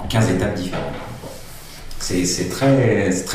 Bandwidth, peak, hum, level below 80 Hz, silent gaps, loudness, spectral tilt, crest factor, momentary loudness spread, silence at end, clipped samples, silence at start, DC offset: 16 kHz; -4 dBFS; none; -36 dBFS; none; -19 LUFS; -5 dB/octave; 16 dB; 21 LU; 0 s; under 0.1%; 0 s; under 0.1%